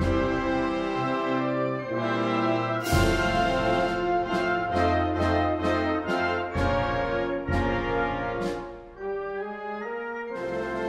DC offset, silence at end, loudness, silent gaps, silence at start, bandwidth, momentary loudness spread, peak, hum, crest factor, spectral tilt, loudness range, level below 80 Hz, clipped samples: under 0.1%; 0 s; -26 LUFS; none; 0 s; 16 kHz; 9 LU; -10 dBFS; none; 16 dB; -6 dB/octave; 5 LU; -40 dBFS; under 0.1%